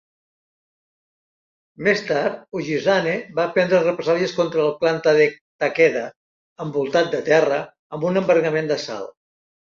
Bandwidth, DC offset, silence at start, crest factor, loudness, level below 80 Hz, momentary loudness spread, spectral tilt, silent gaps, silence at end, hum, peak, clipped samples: 7.4 kHz; under 0.1%; 1.8 s; 18 dB; -20 LUFS; -66 dBFS; 11 LU; -5.5 dB/octave; 5.41-5.59 s, 6.16-6.56 s, 7.79-7.90 s; 0.65 s; none; -2 dBFS; under 0.1%